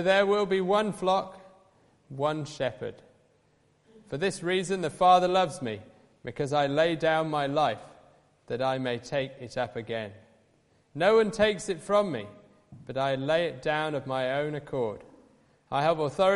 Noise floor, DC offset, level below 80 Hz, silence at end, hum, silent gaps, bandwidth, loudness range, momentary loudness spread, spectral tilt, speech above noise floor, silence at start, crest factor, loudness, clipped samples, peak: -66 dBFS; under 0.1%; -62 dBFS; 0 s; none; none; 11.5 kHz; 7 LU; 15 LU; -5 dB/octave; 39 dB; 0 s; 20 dB; -28 LUFS; under 0.1%; -8 dBFS